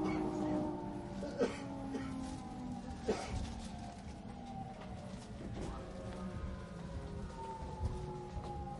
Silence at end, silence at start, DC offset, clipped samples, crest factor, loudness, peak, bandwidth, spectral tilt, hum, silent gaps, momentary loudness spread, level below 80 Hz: 0 s; 0 s; under 0.1%; under 0.1%; 20 dB; -43 LUFS; -22 dBFS; 11.5 kHz; -6.5 dB/octave; none; none; 10 LU; -50 dBFS